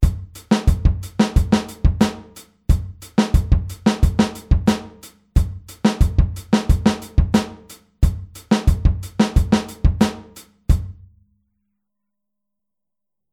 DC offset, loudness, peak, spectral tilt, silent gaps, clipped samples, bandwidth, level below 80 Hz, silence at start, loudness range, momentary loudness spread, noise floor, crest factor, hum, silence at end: under 0.1%; -20 LUFS; -2 dBFS; -6.5 dB/octave; none; under 0.1%; 15.5 kHz; -22 dBFS; 0 s; 3 LU; 8 LU; -86 dBFS; 18 dB; none; 2.4 s